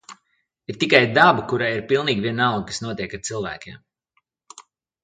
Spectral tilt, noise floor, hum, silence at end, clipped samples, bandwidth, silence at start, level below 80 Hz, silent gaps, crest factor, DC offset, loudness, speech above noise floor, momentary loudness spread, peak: -4.5 dB/octave; -70 dBFS; none; 0.4 s; under 0.1%; 9.8 kHz; 0.1 s; -56 dBFS; none; 22 dB; under 0.1%; -20 LUFS; 50 dB; 19 LU; 0 dBFS